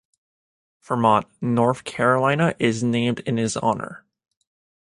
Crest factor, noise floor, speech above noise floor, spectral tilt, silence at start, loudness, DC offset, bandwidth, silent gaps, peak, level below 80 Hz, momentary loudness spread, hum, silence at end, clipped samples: 20 dB; under -90 dBFS; over 69 dB; -6 dB/octave; 0.9 s; -21 LUFS; under 0.1%; 11.5 kHz; none; -2 dBFS; -58 dBFS; 6 LU; none; 0.85 s; under 0.1%